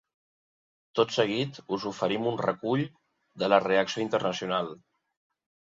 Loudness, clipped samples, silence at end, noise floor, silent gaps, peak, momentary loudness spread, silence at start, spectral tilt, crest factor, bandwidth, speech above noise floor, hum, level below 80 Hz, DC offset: -28 LUFS; under 0.1%; 1 s; under -90 dBFS; none; -6 dBFS; 9 LU; 0.95 s; -5 dB/octave; 22 dB; 7.8 kHz; over 63 dB; none; -70 dBFS; under 0.1%